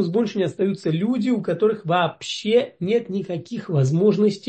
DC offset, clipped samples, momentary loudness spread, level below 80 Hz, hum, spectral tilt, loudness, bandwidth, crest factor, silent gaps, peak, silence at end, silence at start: under 0.1%; under 0.1%; 9 LU; -66 dBFS; none; -7 dB/octave; -22 LUFS; 8.6 kHz; 14 dB; none; -6 dBFS; 0 s; 0 s